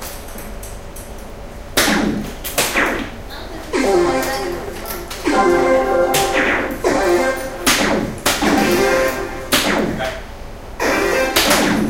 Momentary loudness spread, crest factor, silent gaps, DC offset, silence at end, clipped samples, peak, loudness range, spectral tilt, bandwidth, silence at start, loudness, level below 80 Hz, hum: 18 LU; 18 dB; none; 0.1%; 0 s; under 0.1%; 0 dBFS; 4 LU; -3 dB/octave; 17 kHz; 0 s; -17 LUFS; -34 dBFS; none